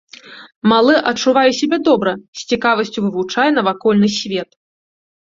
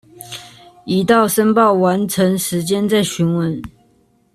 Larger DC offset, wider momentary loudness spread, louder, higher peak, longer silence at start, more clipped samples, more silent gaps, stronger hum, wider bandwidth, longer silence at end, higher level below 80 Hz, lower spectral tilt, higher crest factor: neither; second, 10 LU vs 19 LU; about the same, -15 LUFS vs -15 LUFS; about the same, -2 dBFS vs -2 dBFS; about the same, 0.25 s vs 0.2 s; neither; first, 0.56-0.61 s, 2.28-2.33 s vs none; neither; second, 7.6 kHz vs 14 kHz; first, 0.95 s vs 0.65 s; second, -58 dBFS vs -52 dBFS; about the same, -4.5 dB/octave vs -5 dB/octave; about the same, 14 dB vs 14 dB